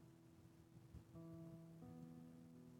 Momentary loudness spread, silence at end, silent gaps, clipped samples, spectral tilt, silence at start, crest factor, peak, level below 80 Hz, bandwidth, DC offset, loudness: 9 LU; 0 s; none; under 0.1%; -8 dB/octave; 0 s; 14 dB; -48 dBFS; -78 dBFS; 17.5 kHz; under 0.1%; -61 LUFS